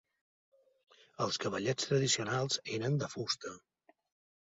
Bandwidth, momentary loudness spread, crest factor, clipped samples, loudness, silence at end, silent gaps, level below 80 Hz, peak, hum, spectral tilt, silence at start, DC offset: 8 kHz; 7 LU; 18 dB; under 0.1%; -34 LUFS; 0.85 s; none; -72 dBFS; -18 dBFS; none; -4 dB/octave; 1.2 s; under 0.1%